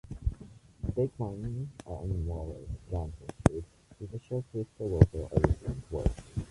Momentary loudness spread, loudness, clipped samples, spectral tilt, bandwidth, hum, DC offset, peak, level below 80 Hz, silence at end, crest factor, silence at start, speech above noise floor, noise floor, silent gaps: 17 LU; -33 LUFS; under 0.1%; -8.5 dB/octave; 11.5 kHz; none; under 0.1%; -2 dBFS; -40 dBFS; 0.05 s; 30 dB; 0.05 s; 21 dB; -52 dBFS; none